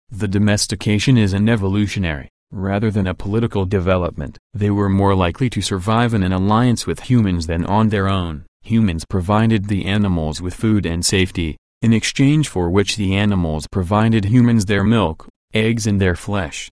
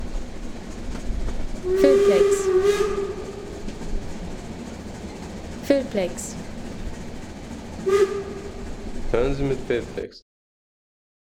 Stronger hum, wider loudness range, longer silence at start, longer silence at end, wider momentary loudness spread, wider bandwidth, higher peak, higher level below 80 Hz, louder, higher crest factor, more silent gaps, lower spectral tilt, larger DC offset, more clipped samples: neither; second, 2 LU vs 8 LU; about the same, 0.1 s vs 0 s; second, 0.05 s vs 1.05 s; second, 8 LU vs 17 LU; second, 11 kHz vs 16 kHz; about the same, -2 dBFS vs -4 dBFS; about the same, -36 dBFS vs -34 dBFS; first, -18 LUFS vs -24 LUFS; second, 14 dB vs 20 dB; first, 2.30-2.47 s, 4.39-4.50 s, 8.48-8.60 s, 11.58-11.81 s, 15.30-15.48 s vs none; about the same, -6 dB/octave vs -5.5 dB/octave; neither; neither